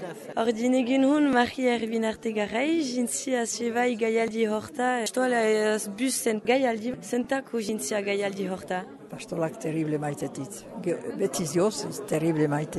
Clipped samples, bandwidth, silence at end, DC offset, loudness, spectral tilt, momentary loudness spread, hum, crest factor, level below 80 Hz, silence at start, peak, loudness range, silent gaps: under 0.1%; 12.5 kHz; 0 s; under 0.1%; -27 LUFS; -4.5 dB/octave; 9 LU; none; 18 dB; -66 dBFS; 0 s; -10 dBFS; 5 LU; none